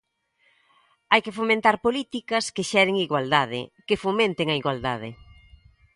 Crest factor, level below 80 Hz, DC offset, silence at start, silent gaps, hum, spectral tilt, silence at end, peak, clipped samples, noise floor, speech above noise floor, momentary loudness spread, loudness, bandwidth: 22 dB; -58 dBFS; under 0.1%; 1.1 s; none; none; -4 dB/octave; 0.8 s; -2 dBFS; under 0.1%; -67 dBFS; 43 dB; 9 LU; -23 LUFS; 11.5 kHz